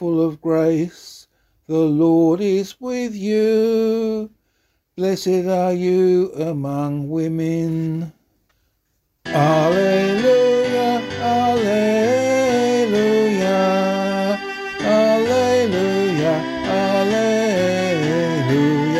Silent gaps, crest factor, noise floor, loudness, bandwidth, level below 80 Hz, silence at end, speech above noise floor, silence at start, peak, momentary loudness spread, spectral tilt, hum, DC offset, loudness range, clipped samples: none; 14 dB; -68 dBFS; -18 LUFS; 15 kHz; -56 dBFS; 0 s; 51 dB; 0 s; -4 dBFS; 8 LU; -6 dB/octave; none; under 0.1%; 4 LU; under 0.1%